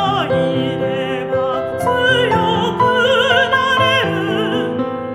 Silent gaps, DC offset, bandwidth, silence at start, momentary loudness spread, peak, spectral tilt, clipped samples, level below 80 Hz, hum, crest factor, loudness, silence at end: none; under 0.1%; 15 kHz; 0 s; 7 LU; 0 dBFS; -5 dB/octave; under 0.1%; -50 dBFS; none; 16 dB; -15 LUFS; 0 s